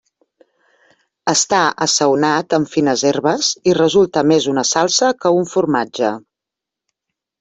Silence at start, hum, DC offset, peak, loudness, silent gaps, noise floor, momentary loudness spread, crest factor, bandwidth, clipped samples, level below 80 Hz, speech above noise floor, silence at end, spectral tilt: 1.25 s; none; under 0.1%; 0 dBFS; -15 LUFS; none; -84 dBFS; 5 LU; 16 dB; 8.4 kHz; under 0.1%; -58 dBFS; 69 dB; 1.2 s; -3.5 dB/octave